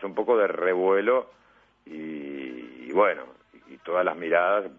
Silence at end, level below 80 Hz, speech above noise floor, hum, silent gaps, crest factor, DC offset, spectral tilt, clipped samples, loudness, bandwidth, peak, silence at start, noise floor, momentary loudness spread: 0.05 s; -72 dBFS; 27 dB; none; none; 18 dB; under 0.1%; -7.5 dB/octave; under 0.1%; -25 LUFS; 3.7 kHz; -8 dBFS; 0 s; -51 dBFS; 17 LU